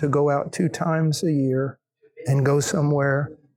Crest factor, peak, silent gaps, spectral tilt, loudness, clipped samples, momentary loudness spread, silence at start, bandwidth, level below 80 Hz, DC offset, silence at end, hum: 14 dB; -8 dBFS; none; -6.5 dB/octave; -22 LUFS; under 0.1%; 6 LU; 0 s; 14 kHz; -62 dBFS; under 0.1%; 0.25 s; none